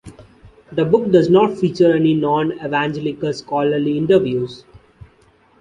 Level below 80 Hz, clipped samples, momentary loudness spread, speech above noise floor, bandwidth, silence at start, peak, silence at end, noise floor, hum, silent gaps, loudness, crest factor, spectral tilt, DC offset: -52 dBFS; under 0.1%; 9 LU; 37 dB; 9.6 kHz; 0.05 s; -2 dBFS; 1.05 s; -53 dBFS; none; none; -17 LUFS; 16 dB; -7.5 dB/octave; under 0.1%